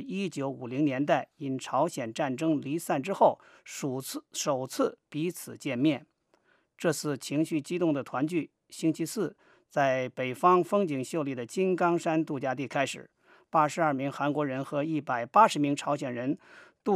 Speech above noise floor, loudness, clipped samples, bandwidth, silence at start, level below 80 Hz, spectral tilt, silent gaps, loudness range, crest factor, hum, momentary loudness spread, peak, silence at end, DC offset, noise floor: 40 dB; -29 LUFS; under 0.1%; 15.5 kHz; 0 s; -84 dBFS; -5.5 dB/octave; none; 4 LU; 22 dB; none; 10 LU; -8 dBFS; 0 s; under 0.1%; -68 dBFS